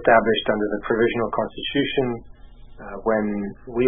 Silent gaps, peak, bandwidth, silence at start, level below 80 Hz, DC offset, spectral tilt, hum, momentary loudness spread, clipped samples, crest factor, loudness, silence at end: none; -2 dBFS; 3.7 kHz; 0 s; -44 dBFS; under 0.1%; -10 dB/octave; none; 11 LU; under 0.1%; 20 dB; -23 LUFS; 0 s